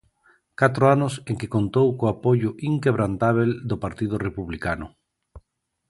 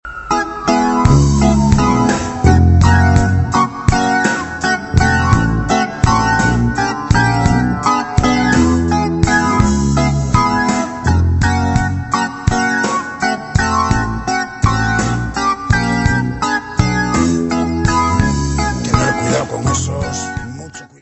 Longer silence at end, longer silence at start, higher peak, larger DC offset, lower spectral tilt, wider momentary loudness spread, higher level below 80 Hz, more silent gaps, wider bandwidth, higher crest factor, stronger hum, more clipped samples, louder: first, 0.5 s vs 0.15 s; first, 0.6 s vs 0.05 s; about the same, -2 dBFS vs 0 dBFS; neither; first, -7.5 dB/octave vs -5.5 dB/octave; first, 11 LU vs 6 LU; second, -48 dBFS vs -24 dBFS; neither; first, 11.5 kHz vs 8.4 kHz; first, 22 dB vs 14 dB; neither; neither; second, -23 LUFS vs -14 LUFS